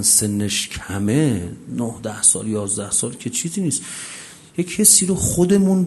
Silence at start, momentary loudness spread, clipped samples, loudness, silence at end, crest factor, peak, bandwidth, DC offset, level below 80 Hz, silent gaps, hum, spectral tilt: 0 s; 15 LU; under 0.1%; -18 LUFS; 0 s; 20 dB; 0 dBFS; 12.5 kHz; under 0.1%; -46 dBFS; none; none; -3.5 dB/octave